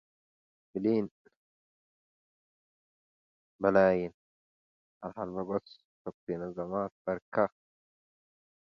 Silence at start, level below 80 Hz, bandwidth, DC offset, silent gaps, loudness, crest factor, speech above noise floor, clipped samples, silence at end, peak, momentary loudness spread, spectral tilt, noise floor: 0.75 s; -68 dBFS; 6.2 kHz; under 0.1%; 1.11-1.25 s, 1.36-3.59 s, 4.14-5.01 s, 5.85-6.05 s, 6.14-6.27 s, 6.92-7.05 s, 7.22-7.32 s; -32 LUFS; 24 dB; over 59 dB; under 0.1%; 1.25 s; -10 dBFS; 18 LU; -9 dB/octave; under -90 dBFS